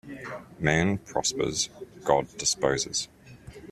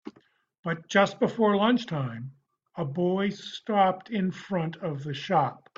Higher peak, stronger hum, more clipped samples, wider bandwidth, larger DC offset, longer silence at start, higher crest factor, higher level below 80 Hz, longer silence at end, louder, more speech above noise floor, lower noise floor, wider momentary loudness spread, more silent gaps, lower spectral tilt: about the same, -6 dBFS vs -8 dBFS; neither; neither; first, 14 kHz vs 7.6 kHz; neither; about the same, 0.05 s vs 0.05 s; about the same, 22 dB vs 20 dB; first, -54 dBFS vs -70 dBFS; second, 0 s vs 0.25 s; about the same, -27 LUFS vs -27 LUFS; second, 20 dB vs 36 dB; second, -47 dBFS vs -63 dBFS; about the same, 15 LU vs 14 LU; second, none vs 0.59-0.63 s; second, -3.5 dB/octave vs -6.5 dB/octave